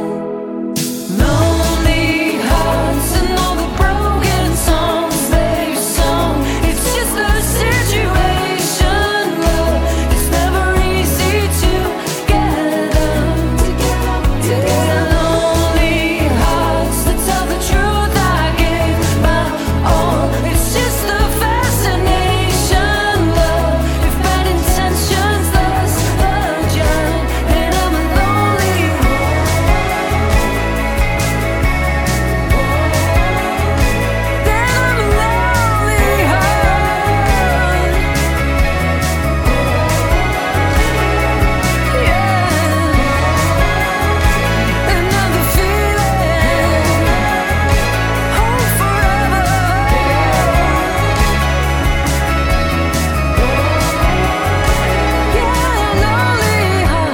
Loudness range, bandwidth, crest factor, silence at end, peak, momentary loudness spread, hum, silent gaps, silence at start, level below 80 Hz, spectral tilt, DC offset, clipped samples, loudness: 1 LU; 17.5 kHz; 12 dB; 0 s; 0 dBFS; 3 LU; none; none; 0 s; -18 dBFS; -5 dB/octave; under 0.1%; under 0.1%; -14 LUFS